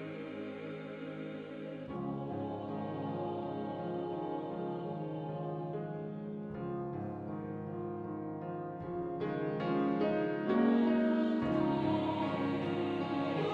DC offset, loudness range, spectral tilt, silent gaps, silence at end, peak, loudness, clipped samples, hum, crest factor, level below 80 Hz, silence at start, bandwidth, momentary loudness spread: under 0.1%; 9 LU; -9 dB/octave; none; 0 s; -18 dBFS; -36 LUFS; under 0.1%; none; 18 dB; -66 dBFS; 0 s; 6.8 kHz; 12 LU